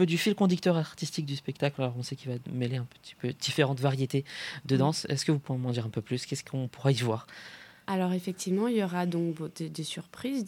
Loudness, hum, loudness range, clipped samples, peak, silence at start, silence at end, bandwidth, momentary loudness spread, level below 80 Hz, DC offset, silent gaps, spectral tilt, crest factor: -31 LUFS; none; 2 LU; under 0.1%; -10 dBFS; 0 s; 0 s; 16.5 kHz; 10 LU; -72 dBFS; under 0.1%; none; -5.5 dB/octave; 20 dB